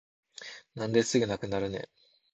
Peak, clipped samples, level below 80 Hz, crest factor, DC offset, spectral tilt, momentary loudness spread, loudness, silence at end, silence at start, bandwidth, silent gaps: -10 dBFS; under 0.1%; -60 dBFS; 22 dB; under 0.1%; -4.5 dB/octave; 20 LU; -30 LUFS; 0.5 s; 0.4 s; 9 kHz; none